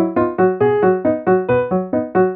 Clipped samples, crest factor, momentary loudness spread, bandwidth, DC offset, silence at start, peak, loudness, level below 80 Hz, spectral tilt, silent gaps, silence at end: under 0.1%; 12 dB; 4 LU; 3.8 kHz; under 0.1%; 0 s; -4 dBFS; -16 LUFS; -50 dBFS; -12.5 dB/octave; none; 0 s